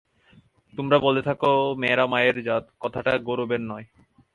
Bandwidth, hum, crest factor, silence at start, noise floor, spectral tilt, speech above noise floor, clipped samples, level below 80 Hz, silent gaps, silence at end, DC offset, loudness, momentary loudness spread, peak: 10.5 kHz; none; 20 dB; 0.75 s; -57 dBFS; -7 dB/octave; 34 dB; under 0.1%; -60 dBFS; none; 0.5 s; under 0.1%; -23 LUFS; 13 LU; -4 dBFS